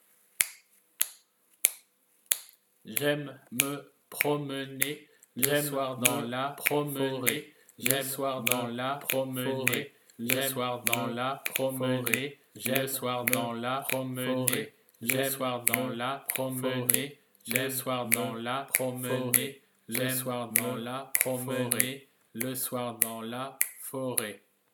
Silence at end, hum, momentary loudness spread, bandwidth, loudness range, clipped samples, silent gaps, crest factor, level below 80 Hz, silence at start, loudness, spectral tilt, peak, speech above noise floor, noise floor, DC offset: 0.35 s; none; 9 LU; 19 kHz; 2 LU; under 0.1%; none; 32 dB; -82 dBFS; 0.4 s; -30 LUFS; -3 dB/octave; 0 dBFS; 36 dB; -67 dBFS; under 0.1%